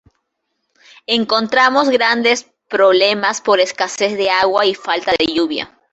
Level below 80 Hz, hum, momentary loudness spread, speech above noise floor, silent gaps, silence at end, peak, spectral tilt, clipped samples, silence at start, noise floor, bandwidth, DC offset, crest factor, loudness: -56 dBFS; none; 7 LU; 57 dB; none; 0.25 s; 0 dBFS; -2.5 dB/octave; under 0.1%; 1.1 s; -72 dBFS; 8.2 kHz; under 0.1%; 16 dB; -15 LUFS